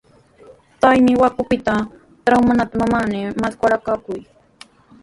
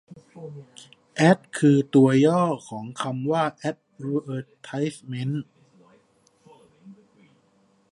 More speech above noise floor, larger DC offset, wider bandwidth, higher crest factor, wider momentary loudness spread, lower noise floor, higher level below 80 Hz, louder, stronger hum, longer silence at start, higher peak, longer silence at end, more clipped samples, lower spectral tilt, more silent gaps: second, 31 dB vs 40 dB; neither; about the same, 11.5 kHz vs 11.5 kHz; about the same, 18 dB vs 22 dB; second, 11 LU vs 23 LU; second, -47 dBFS vs -63 dBFS; first, -46 dBFS vs -72 dBFS; first, -17 LUFS vs -23 LUFS; neither; first, 0.8 s vs 0.1 s; first, 0 dBFS vs -4 dBFS; second, 0.8 s vs 1 s; neither; about the same, -6.5 dB/octave vs -7 dB/octave; neither